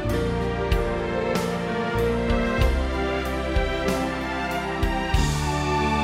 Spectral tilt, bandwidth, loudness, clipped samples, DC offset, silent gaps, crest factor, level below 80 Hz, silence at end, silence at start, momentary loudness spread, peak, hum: -5.5 dB/octave; 16 kHz; -25 LUFS; under 0.1%; under 0.1%; none; 16 dB; -28 dBFS; 0 s; 0 s; 3 LU; -8 dBFS; none